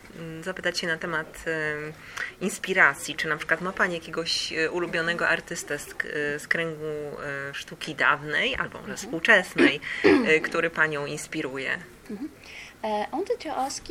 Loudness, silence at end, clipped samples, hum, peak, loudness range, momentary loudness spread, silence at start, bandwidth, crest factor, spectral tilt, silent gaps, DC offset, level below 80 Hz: -26 LUFS; 0 s; under 0.1%; none; -4 dBFS; 5 LU; 15 LU; 0.05 s; 16.5 kHz; 22 dB; -3.5 dB/octave; none; under 0.1%; -58 dBFS